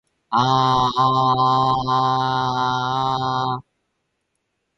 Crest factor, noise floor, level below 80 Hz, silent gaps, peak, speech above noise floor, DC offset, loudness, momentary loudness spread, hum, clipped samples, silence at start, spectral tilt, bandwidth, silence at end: 16 dB; -74 dBFS; -52 dBFS; none; -6 dBFS; 55 dB; under 0.1%; -19 LUFS; 6 LU; none; under 0.1%; 0.3 s; -6 dB/octave; 9.4 kHz; 1.15 s